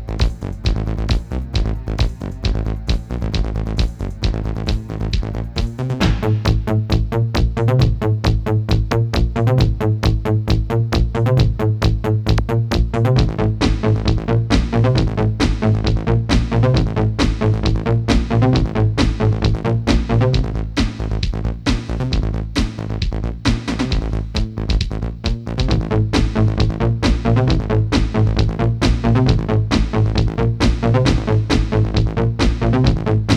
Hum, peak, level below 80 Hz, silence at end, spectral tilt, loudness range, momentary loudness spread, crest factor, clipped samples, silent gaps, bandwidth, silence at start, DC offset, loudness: none; 0 dBFS; -22 dBFS; 0 s; -7 dB/octave; 5 LU; 7 LU; 16 dB; under 0.1%; none; 9.6 kHz; 0 s; under 0.1%; -18 LUFS